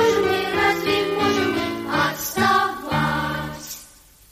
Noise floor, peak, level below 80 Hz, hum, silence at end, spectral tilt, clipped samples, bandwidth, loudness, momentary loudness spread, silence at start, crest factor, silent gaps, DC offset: -48 dBFS; -8 dBFS; -48 dBFS; none; 0.45 s; -4 dB/octave; under 0.1%; 15.5 kHz; -21 LUFS; 11 LU; 0 s; 14 dB; none; under 0.1%